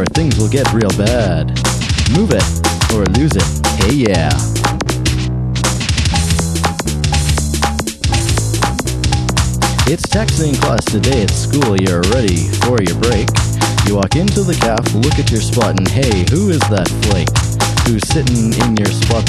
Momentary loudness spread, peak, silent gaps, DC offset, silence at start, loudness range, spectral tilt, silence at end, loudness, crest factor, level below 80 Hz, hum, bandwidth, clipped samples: 3 LU; 0 dBFS; none; under 0.1%; 0 s; 2 LU; -5 dB/octave; 0 s; -14 LUFS; 14 dB; -22 dBFS; none; 14 kHz; under 0.1%